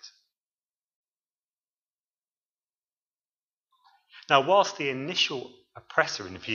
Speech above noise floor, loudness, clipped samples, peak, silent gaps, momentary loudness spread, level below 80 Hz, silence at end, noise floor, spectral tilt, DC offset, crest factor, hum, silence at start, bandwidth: over 64 dB; -25 LUFS; under 0.1%; -4 dBFS; 0.40-1.04 s, 1.16-1.24 s, 1.31-1.86 s, 1.93-2.68 s, 2.78-3.11 s, 3.25-3.64 s; 14 LU; -76 dBFS; 0 s; under -90 dBFS; -3 dB/octave; under 0.1%; 28 dB; none; 0.05 s; 7.4 kHz